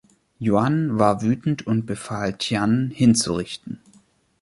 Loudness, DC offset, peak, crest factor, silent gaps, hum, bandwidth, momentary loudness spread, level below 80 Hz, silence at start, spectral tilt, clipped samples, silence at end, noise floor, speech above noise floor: -22 LUFS; under 0.1%; -2 dBFS; 20 dB; none; none; 11.5 kHz; 12 LU; -52 dBFS; 0.4 s; -5.5 dB/octave; under 0.1%; 0.65 s; -58 dBFS; 37 dB